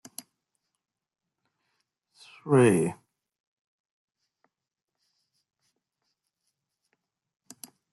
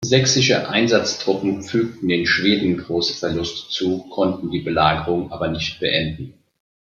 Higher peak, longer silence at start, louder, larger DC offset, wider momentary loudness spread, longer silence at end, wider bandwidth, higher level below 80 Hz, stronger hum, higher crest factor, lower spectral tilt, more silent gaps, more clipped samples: second, -10 dBFS vs -2 dBFS; first, 2.45 s vs 0 s; second, -23 LUFS vs -19 LUFS; neither; first, 26 LU vs 8 LU; first, 5 s vs 0.6 s; first, 12.5 kHz vs 7.6 kHz; second, -74 dBFS vs -48 dBFS; neither; first, 24 dB vs 18 dB; first, -6.5 dB/octave vs -4 dB/octave; neither; neither